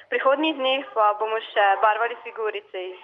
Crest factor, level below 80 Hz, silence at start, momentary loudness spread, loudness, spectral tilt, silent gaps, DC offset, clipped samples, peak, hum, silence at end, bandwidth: 16 dB; -84 dBFS; 0.1 s; 10 LU; -22 LUFS; -4 dB/octave; none; under 0.1%; under 0.1%; -6 dBFS; none; 0.05 s; 5.4 kHz